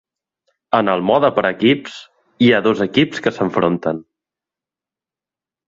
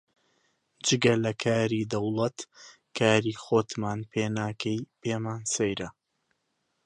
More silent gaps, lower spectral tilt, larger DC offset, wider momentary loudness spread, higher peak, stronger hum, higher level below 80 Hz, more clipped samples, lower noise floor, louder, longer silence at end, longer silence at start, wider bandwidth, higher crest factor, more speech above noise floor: neither; first, -6.5 dB/octave vs -4.5 dB/octave; neither; about the same, 9 LU vs 9 LU; first, 0 dBFS vs -6 dBFS; neither; first, -56 dBFS vs -62 dBFS; neither; first, -89 dBFS vs -77 dBFS; first, -16 LUFS vs -28 LUFS; first, 1.65 s vs 0.95 s; second, 0.7 s vs 0.85 s; second, 7.6 kHz vs 11 kHz; about the same, 18 dB vs 22 dB; first, 73 dB vs 49 dB